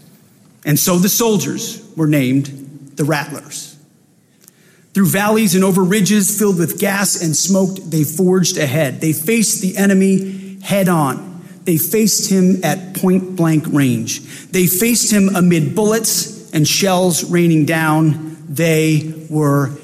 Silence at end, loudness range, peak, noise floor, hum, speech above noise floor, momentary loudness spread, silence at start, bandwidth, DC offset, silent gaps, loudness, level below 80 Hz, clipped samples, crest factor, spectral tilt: 0 s; 4 LU; -4 dBFS; -52 dBFS; none; 38 dB; 11 LU; 0.65 s; 16 kHz; under 0.1%; none; -15 LUFS; -56 dBFS; under 0.1%; 12 dB; -4.5 dB/octave